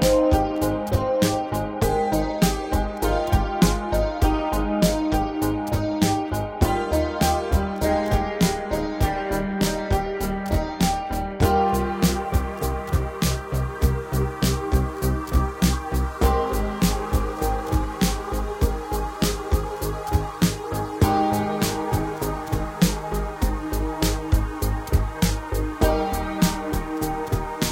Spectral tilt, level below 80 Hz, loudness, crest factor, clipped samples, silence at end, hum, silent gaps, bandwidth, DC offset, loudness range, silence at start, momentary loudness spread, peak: -5.5 dB/octave; -28 dBFS; -24 LUFS; 18 dB; under 0.1%; 0 s; none; none; 17 kHz; under 0.1%; 2 LU; 0 s; 6 LU; -4 dBFS